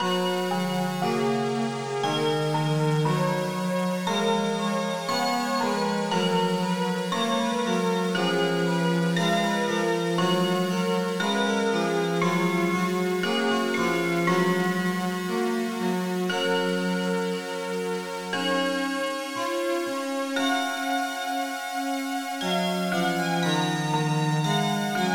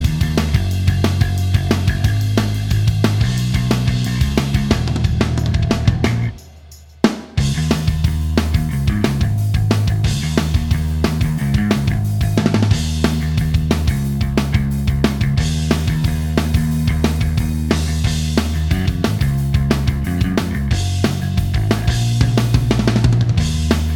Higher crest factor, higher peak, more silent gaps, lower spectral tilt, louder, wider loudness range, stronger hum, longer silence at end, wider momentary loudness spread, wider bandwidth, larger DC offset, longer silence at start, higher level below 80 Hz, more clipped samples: about the same, 14 dB vs 16 dB; second, -12 dBFS vs 0 dBFS; neither; about the same, -5 dB/octave vs -6 dB/octave; second, -25 LUFS vs -17 LUFS; about the same, 3 LU vs 2 LU; neither; about the same, 0 s vs 0 s; about the same, 5 LU vs 3 LU; about the same, 19.5 kHz vs 19.5 kHz; neither; about the same, 0 s vs 0 s; second, -70 dBFS vs -24 dBFS; neither